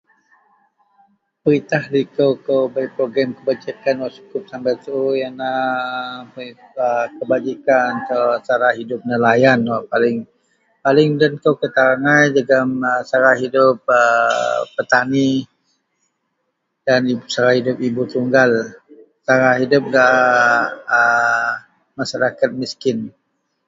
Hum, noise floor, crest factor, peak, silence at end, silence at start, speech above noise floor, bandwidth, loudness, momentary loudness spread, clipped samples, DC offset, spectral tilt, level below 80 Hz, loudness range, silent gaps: none; -72 dBFS; 18 dB; 0 dBFS; 0.6 s; 1.45 s; 55 dB; 7.8 kHz; -17 LUFS; 11 LU; under 0.1%; under 0.1%; -5.5 dB/octave; -64 dBFS; 6 LU; none